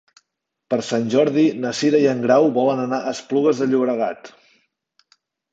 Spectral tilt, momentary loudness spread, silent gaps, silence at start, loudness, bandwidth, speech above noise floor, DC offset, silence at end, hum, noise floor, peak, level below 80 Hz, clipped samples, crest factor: -5.5 dB/octave; 9 LU; none; 0.7 s; -19 LUFS; 8 kHz; 60 dB; under 0.1%; 1.25 s; none; -78 dBFS; -4 dBFS; -68 dBFS; under 0.1%; 16 dB